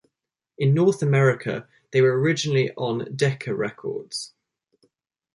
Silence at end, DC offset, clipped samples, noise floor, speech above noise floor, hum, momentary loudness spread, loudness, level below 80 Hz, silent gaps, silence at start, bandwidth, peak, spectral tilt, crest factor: 1.05 s; under 0.1%; under 0.1%; -82 dBFS; 60 dB; none; 13 LU; -23 LUFS; -64 dBFS; none; 0.6 s; 11.5 kHz; -6 dBFS; -6 dB/octave; 18 dB